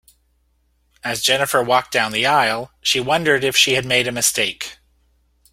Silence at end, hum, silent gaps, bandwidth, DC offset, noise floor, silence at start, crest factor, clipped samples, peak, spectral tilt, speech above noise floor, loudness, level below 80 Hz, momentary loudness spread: 0.8 s; none; none; 16.5 kHz; under 0.1%; -63 dBFS; 1.05 s; 20 dB; under 0.1%; 0 dBFS; -2 dB/octave; 45 dB; -17 LUFS; -54 dBFS; 8 LU